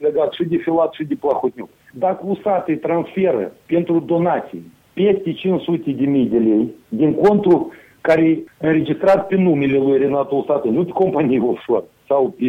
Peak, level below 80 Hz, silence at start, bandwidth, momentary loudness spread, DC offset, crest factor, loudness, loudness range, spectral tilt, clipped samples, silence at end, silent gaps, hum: -4 dBFS; -56 dBFS; 0 s; 6 kHz; 7 LU; under 0.1%; 14 dB; -18 LUFS; 4 LU; -9 dB/octave; under 0.1%; 0 s; none; none